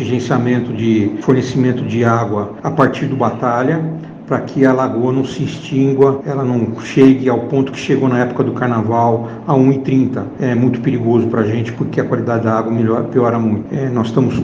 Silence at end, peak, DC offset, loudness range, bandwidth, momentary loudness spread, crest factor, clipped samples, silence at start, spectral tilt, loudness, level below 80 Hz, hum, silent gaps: 0 s; 0 dBFS; under 0.1%; 2 LU; 7.6 kHz; 6 LU; 14 dB; under 0.1%; 0 s; -8 dB/octave; -15 LUFS; -52 dBFS; none; none